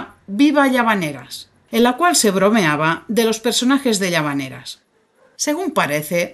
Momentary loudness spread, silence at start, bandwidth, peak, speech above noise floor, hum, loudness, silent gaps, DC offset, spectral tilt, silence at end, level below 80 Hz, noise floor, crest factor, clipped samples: 15 LU; 0 s; 12.5 kHz; -2 dBFS; 39 dB; none; -17 LUFS; none; under 0.1%; -3.5 dB/octave; 0 s; -60 dBFS; -56 dBFS; 16 dB; under 0.1%